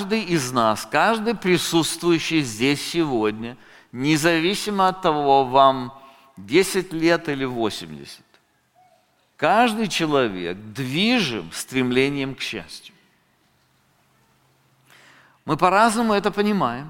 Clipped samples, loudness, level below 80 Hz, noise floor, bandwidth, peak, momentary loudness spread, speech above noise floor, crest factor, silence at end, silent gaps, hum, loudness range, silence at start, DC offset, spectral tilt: under 0.1%; -20 LUFS; -54 dBFS; -62 dBFS; 17 kHz; -2 dBFS; 13 LU; 42 dB; 20 dB; 0 s; none; none; 7 LU; 0 s; under 0.1%; -4.5 dB/octave